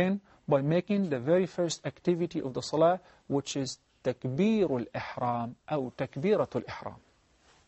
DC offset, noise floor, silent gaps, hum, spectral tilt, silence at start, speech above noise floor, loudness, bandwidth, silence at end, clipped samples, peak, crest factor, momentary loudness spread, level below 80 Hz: under 0.1%; -64 dBFS; none; none; -6 dB/octave; 0 s; 35 dB; -30 LUFS; 8.2 kHz; 0.7 s; under 0.1%; -12 dBFS; 18 dB; 9 LU; -66 dBFS